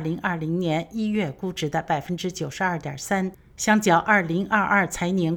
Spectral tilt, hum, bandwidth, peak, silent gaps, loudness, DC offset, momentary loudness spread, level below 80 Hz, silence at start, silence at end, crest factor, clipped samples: -5 dB/octave; none; 18.5 kHz; -4 dBFS; none; -24 LUFS; under 0.1%; 10 LU; -52 dBFS; 0 s; 0 s; 20 dB; under 0.1%